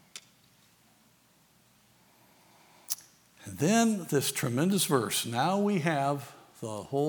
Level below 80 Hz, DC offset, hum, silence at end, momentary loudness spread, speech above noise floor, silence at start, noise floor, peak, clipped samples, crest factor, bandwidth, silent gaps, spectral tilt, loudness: -76 dBFS; under 0.1%; none; 0 s; 20 LU; 36 dB; 0.15 s; -64 dBFS; -8 dBFS; under 0.1%; 22 dB; over 20 kHz; none; -4.5 dB/octave; -29 LUFS